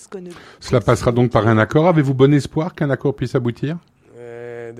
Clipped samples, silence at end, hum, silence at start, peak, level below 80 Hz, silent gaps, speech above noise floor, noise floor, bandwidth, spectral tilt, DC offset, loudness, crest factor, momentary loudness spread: under 0.1%; 0 s; none; 0.1 s; 0 dBFS; -44 dBFS; none; 20 dB; -37 dBFS; 12 kHz; -7.5 dB/octave; under 0.1%; -17 LUFS; 18 dB; 20 LU